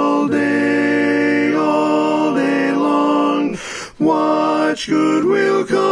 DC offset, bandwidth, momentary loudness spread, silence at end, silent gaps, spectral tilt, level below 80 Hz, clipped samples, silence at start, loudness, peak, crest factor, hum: under 0.1%; 10.5 kHz; 3 LU; 0 s; none; -5.5 dB/octave; -56 dBFS; under 0.1%; 0 s; -16 LUFS; -4 dBFS; 12 dB; none